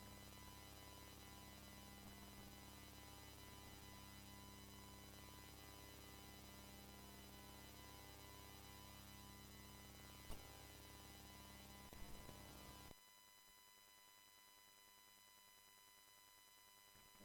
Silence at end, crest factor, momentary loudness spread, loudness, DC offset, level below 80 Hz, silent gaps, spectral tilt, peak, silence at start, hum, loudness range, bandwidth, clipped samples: 0 s; 20 dB; 7 LU; -60 LUFS; under 0.1%; -68 dBFS; none; -3.5 dB/octave; -40 dBFS; 0 s; none; 6 LU; 18 kHz; under 0.1%